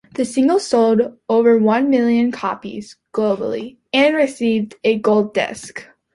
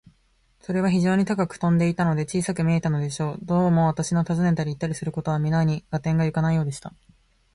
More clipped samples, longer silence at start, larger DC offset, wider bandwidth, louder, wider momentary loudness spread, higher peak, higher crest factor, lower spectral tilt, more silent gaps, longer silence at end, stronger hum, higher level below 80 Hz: neither; second, 0.2 s vs 0.7 s; neither; about the same, 11.5 kHz vs 11.5 kHz; first, -17 LUFS vs -23 LUFS; first, 14 LU vs 7 LU; first, -4 dBFS vs -10 dBFS; about the same, 14 dB vs 14 dB; second, -5 dB/octave vs -7 dB/octave; neither; second, 0.3 s vs 0.65 s; neither; second, -60 dBFS vs -50 dBFS